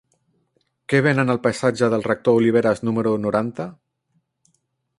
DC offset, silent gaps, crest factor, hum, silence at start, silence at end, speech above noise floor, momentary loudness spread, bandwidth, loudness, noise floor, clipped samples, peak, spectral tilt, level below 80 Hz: under 0.1%; none; 18 dB; none; 0.9 s; 1.25 s; 50 dB; 11 LU; 11.5 kHz; -20 LUFS; -69 dBFS; under 0.1%; -4 dBFS; -7 dB/octave; -58 dBFS